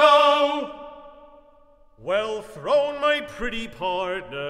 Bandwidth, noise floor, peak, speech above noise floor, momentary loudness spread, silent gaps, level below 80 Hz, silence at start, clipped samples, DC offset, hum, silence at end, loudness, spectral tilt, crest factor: 12 kHz; -54 dBFS; -4 dBFS; 28 dB; 17 LU; none; -50 dBFS; 0 s; under 0.1%; under 0.1%; none; 0 s; -23 LUFS; -3.5 dB/octave; 20 dB